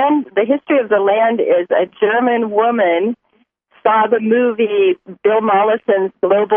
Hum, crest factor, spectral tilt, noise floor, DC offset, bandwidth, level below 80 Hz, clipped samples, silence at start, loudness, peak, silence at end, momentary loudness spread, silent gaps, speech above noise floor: none; 14 dB; -9.5 dB/octave; -60 dBFS; under 0.1%; 3.6 kHz; -70 dBFS; under 0.1%; 0 s; -15 LUFS; -2 dBFS; 0 s; 4 LU; none; 46 dB